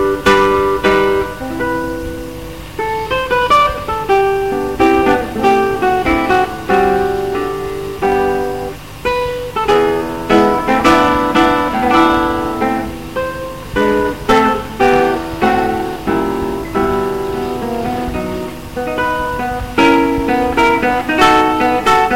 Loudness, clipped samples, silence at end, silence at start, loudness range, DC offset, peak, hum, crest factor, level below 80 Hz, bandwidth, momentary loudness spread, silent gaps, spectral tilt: -14 LUFS; under 0.1%; 0 s; 0 s; 4 LU; 1%; 0 dBFS; 50 Hz at -35 dBFS; 14 dB; -34 dBFS; 16.5 kHz; 10 LU; none; -5 dB/octave